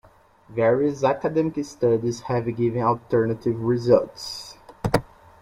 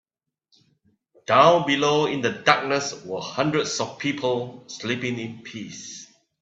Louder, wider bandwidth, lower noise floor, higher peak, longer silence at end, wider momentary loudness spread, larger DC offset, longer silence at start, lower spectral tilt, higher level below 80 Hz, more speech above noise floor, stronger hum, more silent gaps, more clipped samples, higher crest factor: about the same, -23 LUFS vs -22 LUFS; first, 16 kHz vs 8.2 kHz; second, -52 dBFS vs -71 dBFS; second, -4 dBFS vs 0 dBFS; about the same, 0.35 s vs 0.35 s; second, 12 LU vs 19 LU; neither; second, 0.5 s vs 1.3 s; first, -7 dB/octave vs -4 dB/octave; first, -52 dBFS vs -66 dBFS; second, 30 dB vs 48 dB; neither; neither; neither; about the same, 20 dB vs 24 dB